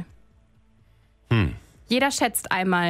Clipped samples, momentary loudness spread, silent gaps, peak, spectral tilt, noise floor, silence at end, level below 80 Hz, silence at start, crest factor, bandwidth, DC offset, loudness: under 0.1%; 14 LU; none; -8 dBFS; -4.5 dB/octave; -59 dBFS; 0 s; -46 dBFS; 0 s; 18 dB; 16 kHz; under 0.1%; -24 LUFS